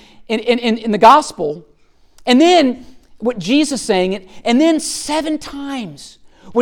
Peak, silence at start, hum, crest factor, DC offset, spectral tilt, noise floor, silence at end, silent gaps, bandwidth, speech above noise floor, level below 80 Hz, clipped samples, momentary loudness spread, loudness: 0 dBFS; 0.2 s; none; 16 dB; under 0.1%; -4 dB/octave; -49 dBFS; 0 s; none; 17 kHz; 34 dB; -48 dBFS; under 0.1%; 16 LU; -15 LUFS